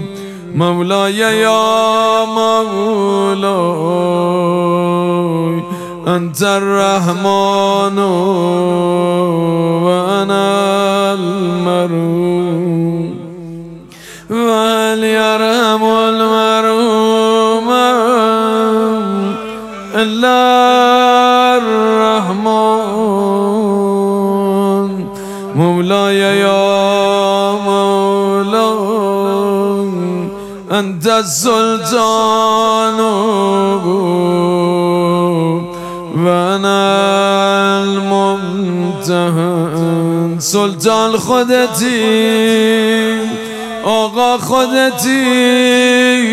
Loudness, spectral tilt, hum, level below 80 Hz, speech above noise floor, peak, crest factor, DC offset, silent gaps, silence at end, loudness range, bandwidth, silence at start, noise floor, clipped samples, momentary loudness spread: -12 LUFS; -5 dB/octave; none; -52 dBFS; 22 dB; 0 dBFS; 12 dB; under 0.1%; none; 0 s; 3 LU; 16 kHz; 0 s; -34 dBFS; under 0.1%; 7 LU